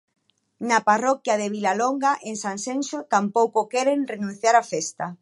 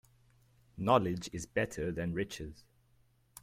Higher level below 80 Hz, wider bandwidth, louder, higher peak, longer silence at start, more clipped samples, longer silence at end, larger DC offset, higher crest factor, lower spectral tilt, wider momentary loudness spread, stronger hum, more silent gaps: second, -78 dBFS vs -58 dBFS; second, 11.5 kHz vs 16 kHz; first, -23 LUFS vs -34 LUFS; first, -4 dBFS vs -12 dBFS; second, 0.6 s vs 0.75 s; neither; about the same, 0.05 s vs 0.05 s; neither; second, 18 dB vs 24 dB; second, -3.5 dB/octave vs -5.5 dB/octave; second, 9 LU vs 12 LU; neither; neither